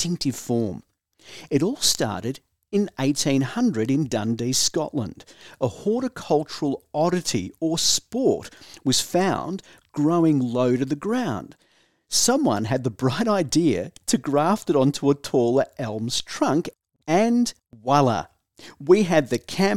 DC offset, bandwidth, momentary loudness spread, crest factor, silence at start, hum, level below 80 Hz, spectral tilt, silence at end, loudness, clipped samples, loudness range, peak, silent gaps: 0.2%; 17 kHz; 10 LU; 18 dB; 0 s; none; -58 dBFS; -4.5 dB/octave; 0 s; -23 LUFS; under 0.1%; 2 LU; -4 dBFS; none